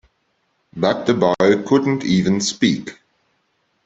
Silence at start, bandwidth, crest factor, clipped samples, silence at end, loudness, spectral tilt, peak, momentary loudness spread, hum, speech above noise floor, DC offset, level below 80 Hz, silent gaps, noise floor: 0.75 s; 8.2 kHz; 16 dB; under 0.1%; 0.95 s; -18 LUFS; -5 dB/octave; -2 dBFS; 9 LU; none; 50 dB; under 0.1%; -56 dBFS; none; -67 dBFS